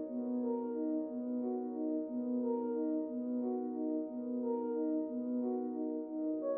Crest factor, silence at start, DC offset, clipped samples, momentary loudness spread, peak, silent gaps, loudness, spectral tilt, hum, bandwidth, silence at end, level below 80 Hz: 12 dB; 0 s; under 0.1%; under 0.1%; 3 LU; -26 dBFS; none; -38 LUFS; -6.5 dB/octave; none; 2 kHz; 0 s; -86 dBFS